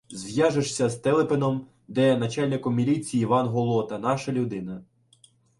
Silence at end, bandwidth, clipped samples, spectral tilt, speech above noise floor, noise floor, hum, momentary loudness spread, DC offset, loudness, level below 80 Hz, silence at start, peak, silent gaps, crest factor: 0.75 s; 11.5 kHz; under 0.1%; -6 dB/octave; 35 dB; -59 dBFS; none; 9 LU; under 0.1%; -25 LUFS; -62 dBFS; 0.1 s; -8 dBFS; none; 16 dB